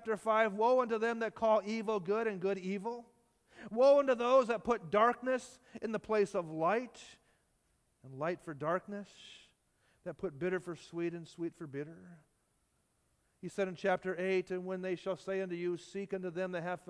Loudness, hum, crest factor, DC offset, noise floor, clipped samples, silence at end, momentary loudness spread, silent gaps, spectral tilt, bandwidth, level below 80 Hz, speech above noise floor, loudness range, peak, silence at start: -34 LUFS; none; 20 dB; under 0.1%; -77 dBFS; under 0.1%; 0.1 s; 17 LU; none; -6 dB/octave; 11 kHz; -74 dBFS; 42 dB; 11 LU; -16 dBFS; 0 s